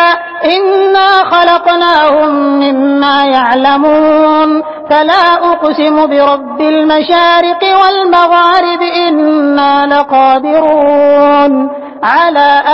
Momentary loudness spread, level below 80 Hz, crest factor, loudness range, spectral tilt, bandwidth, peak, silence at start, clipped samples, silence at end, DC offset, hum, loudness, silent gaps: 4 LU; -50 dBFS; 8 dB; 1 LU; -5 dB/octave; 8 kHz; 0 dBFS; 0 s; 0.4%; 0 s; 0.3%; none; -8 LUFS; none